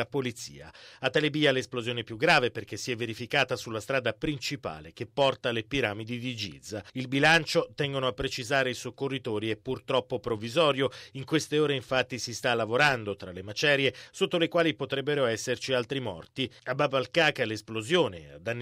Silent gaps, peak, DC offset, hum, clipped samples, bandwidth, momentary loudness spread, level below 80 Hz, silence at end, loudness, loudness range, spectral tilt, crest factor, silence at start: none; -10 dBFS; under 0.1%; none; under 0.1%; 15.5 kHz; 12 LU; -58 dBFS; 0 s; -28 LUFS; 3 LU; -4.5 dB/octave; 18 dB; 0 s